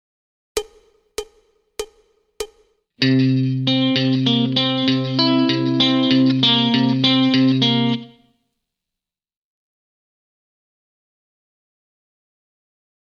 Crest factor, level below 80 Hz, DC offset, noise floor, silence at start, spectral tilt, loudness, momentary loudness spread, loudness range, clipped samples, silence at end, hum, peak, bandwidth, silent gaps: 18 dB; -58 dBFS; under 0.1%; -86 dBFS; 0.55 s; -5.5 dB/octave; -17 LUFS; 18 LU; 9 LU; under 0.1%; 5 s; none; -2 dBFS; 13 kHz; none